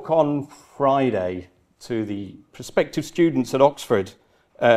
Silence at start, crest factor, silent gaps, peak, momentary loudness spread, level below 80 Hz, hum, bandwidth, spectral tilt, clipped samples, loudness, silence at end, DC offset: 0 s; 20 dB; none; -2 dBFS; 16 LU; -58 dBFS; none; 14.5 kHz; -6 dB/octave; under 0.1%; -22 LUFS; 0 s; under 0.1%